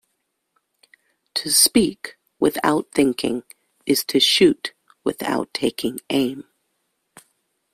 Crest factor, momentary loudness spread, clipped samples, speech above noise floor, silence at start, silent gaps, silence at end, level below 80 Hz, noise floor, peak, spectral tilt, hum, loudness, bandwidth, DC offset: 20 dB; 16 LU; under 0.1%; 54 dB; 1.35 s; none; 1.35 s; -58 dBFS; -74 dBFS; -2 dBFS; -2.5 dB/octave; none; -20 LUFS; 16 kHz; under 0.1%